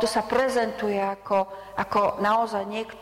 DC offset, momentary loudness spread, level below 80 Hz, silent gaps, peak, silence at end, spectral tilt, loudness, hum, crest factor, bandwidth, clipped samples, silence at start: under 0.1%; 8 LU; -56 dBFS; none; -12 dBFS; 0 s; -4.5 dB/octave; -25 LUFS; none; 12 dB; 16 kHz; under 0.1%; 0 s